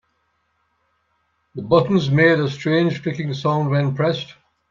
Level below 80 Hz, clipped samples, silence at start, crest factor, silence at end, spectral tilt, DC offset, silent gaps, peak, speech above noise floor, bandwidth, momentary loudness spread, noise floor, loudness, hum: -56 dBFS; under 0.1%; 1.55 s; 18 dB; 0.4 s; -7.5 dB/octave; under 0.1%; none; -2 dBFS; 50 dB; 7.4 kHz; 13 LU; -68 dBFS; -19 LUFS; none